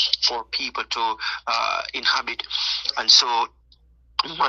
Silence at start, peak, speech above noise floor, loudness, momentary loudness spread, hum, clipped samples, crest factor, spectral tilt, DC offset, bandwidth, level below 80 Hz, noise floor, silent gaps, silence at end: 0 s; -2 dBFS; 33 dB; -21 LUFS; 12 LU; none; under 0.1%; 22 dB; 1 dB/octave; under 0.1%; 7.8 kHz; -58 dBFS; -56 dBFS; none; 0 s